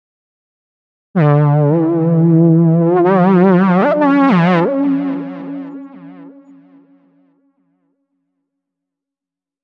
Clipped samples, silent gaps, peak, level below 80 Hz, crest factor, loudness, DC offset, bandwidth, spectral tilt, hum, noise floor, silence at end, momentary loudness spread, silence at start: under 0.1%; none; 0 dBFS; -68 dBFS; 14 dB; -12 LUFS; under 0.1%; 5 kHz; -10.5 dB/octave; none; -87 dBFS; 3.35 s; 16 LU; 1.15 s